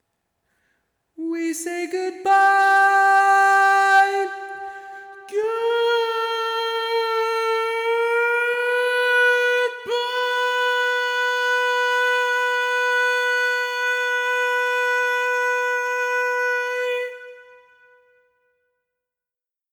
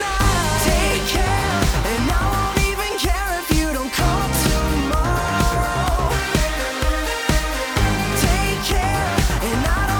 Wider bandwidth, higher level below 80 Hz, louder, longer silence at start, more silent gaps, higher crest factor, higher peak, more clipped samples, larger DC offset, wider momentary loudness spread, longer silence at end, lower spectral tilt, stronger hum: about the same, over 20 kHz vs over 20 kHz; second, -80 dBFS vs -24 dBFS; about the same, -19 LUFS vs -19 LUFS; first, 1.2 s vs 0 s; neither; about the same, 14 dB vs 14 dB; about the same, -6 dBFS vs -4 dBFS; neither; neither; first, 11 LU vs 3 LU; first, 2.3 s vs 0 s; second, 0.5 dB/octave vs -4 dB/octave; neither